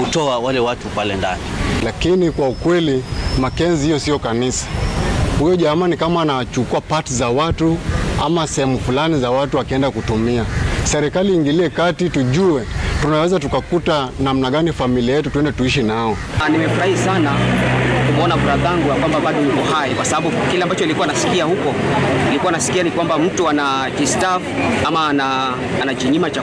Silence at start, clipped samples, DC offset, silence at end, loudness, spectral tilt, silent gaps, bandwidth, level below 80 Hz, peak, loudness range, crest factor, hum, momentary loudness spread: 0 s; under 0.1%; under 0.1%; 0 s; -17 LUFS; -5 dB/octave; none; 11 kHz; -30 dBFS; -6 dBFS; 2 LU; 10 dB; none; 4 LU